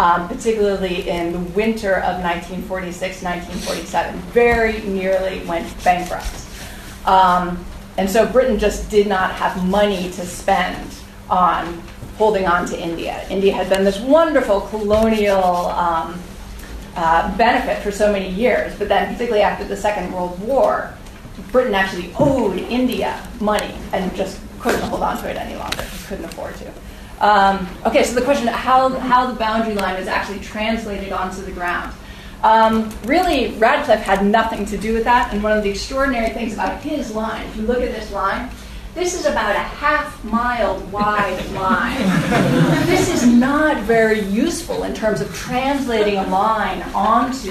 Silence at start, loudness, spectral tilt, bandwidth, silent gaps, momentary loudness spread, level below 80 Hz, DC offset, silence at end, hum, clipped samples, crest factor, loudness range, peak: 0 s; -18 LUFS; -5 dB/octave; 13.5 kHz; none; 11 LU; -36 dBFS; under 0.1%; 0 s; none; under 0.1%; 16 dB; 5 LU; -2 dBFS